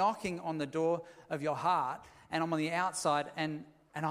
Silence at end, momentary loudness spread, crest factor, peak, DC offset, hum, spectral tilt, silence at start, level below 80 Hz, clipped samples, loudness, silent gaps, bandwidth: 0 s; 9 LU; 18 dB; -16 dBFS; under 0.1%; none; -5 dB/octave; 0 s; -72 dBFS; under 0.1%; -34 LUFS; none; 15.5 kHz